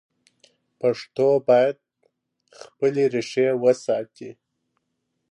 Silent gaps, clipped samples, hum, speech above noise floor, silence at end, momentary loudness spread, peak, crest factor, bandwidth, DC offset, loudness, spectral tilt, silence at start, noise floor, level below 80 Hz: none; under 0.1%; none; 55 dB; 1 s; 20 LU; -6 dBFS; 18 dB; 10.5 kHz; under 0.1%; -22 LUFS; -6 dB/octave; 0.85 s; -76 dBFS; -76 dBFS